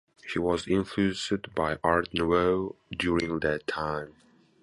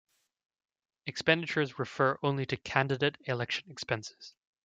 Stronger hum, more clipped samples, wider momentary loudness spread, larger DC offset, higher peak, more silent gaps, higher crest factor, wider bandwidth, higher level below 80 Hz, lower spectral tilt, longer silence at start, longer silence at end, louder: neither; neither; second, 8 LU vs 11 LU; neither; about the same, -8 dBFS vs -10 dBFS; neither; about the same, 22 dB vs 24 dB; first, 11.5 kHz vs 9 kHz; first, -50 dBFS vs -68 dBFS; about the same, -5.5 dB/octave vs -5 dB/octave; second, 0.25 s vs 1.05 s; first, 0.5 s vs 0.35 s; first, -28 LUFS vs -31 LUFS